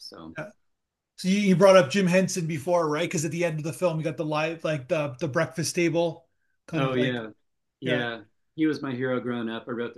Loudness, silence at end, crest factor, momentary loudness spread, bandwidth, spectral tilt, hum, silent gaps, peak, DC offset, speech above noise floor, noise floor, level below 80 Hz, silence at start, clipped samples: -25 LUFS; 0.05 s; 22 dB; 15 LU; 12.5 kHz; -5.5 dB/octave; none; none; -4 dBFS; under 0.1%; 54 dB; -79 dBFS; -72 dBFS; 0 s; under 0.1%